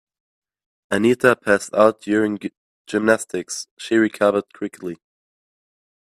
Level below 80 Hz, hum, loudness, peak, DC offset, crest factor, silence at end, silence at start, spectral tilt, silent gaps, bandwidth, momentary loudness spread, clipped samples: -62 dBFS; none; -20 LUFS; 0 dBFS; under 0.1%; 20 dB; 1.05 s; 0.9 s; -4.5 dB/octave; 2.57-2.85 s, 3.71-3.77 s; 14 kHz; 15 LU; under 0.1%